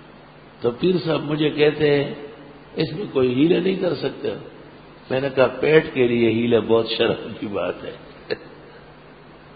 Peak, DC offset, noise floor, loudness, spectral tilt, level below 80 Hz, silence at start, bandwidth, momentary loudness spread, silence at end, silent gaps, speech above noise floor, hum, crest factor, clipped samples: 0 dBFS; under 0.1%; -45 dBFS; -21 LUFS; -11 dB/octave; -54 dBFS; 0 s; 5 kHz; 15 LU; 0.2 s; none; 25 dB; none; 20 dB; under 0.1%